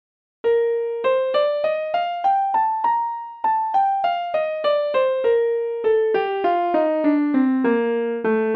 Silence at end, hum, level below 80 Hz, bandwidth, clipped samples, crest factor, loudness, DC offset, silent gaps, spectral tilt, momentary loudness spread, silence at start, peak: 0 s; none; -68 dBFS; 5.4 kHz; under 0.1%; 12 dB; -20 LUFS; under 0.1%; none; -7 dB/octave; 4 LU; 0.45 s; -8 dBFS